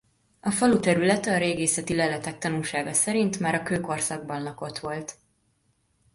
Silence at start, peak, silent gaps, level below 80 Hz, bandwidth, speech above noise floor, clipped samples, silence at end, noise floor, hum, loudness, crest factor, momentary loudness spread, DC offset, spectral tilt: 0.45 s; -8 dBFS; none; -58 dBFS; 12 kHz; 44 dB; under 0.1%; 1.05 s; -69 dBFS; none; -25 LUFS; 20 dB; 12 LU; under 0.1%; -4 dB/octave